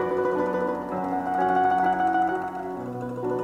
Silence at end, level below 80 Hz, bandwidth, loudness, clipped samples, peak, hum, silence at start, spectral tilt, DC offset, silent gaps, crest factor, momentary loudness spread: 0 s; -58 dBFS; 10 kHz; -25 LUFS; under 0.1%; -12 dBFS; none; 0 s; -7.5 dB/octave; under 0.1%; none; 12 dB; 11 LU